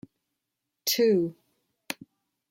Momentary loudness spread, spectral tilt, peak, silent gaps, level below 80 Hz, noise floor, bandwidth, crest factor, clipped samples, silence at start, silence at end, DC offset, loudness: 16 LU; -4 dB/octave; -12 dBFS; none; -76 dBFS; -84 dBFS; 16.5 kHz; 18 dB; under 0.1%; 0.85 s; 0.55 s; under 0.1%; -26 LUFS